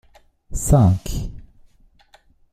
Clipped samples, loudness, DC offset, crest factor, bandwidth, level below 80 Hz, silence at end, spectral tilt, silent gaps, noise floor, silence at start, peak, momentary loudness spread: under 0.1%; -19 LUFS; under 0.1%; 20 dB; 16 kHz; -32 dBFS; 1.15 s; -7 dB/octave; none; -54 dBFS; 0.5 s; -2 dBFS; 18 LU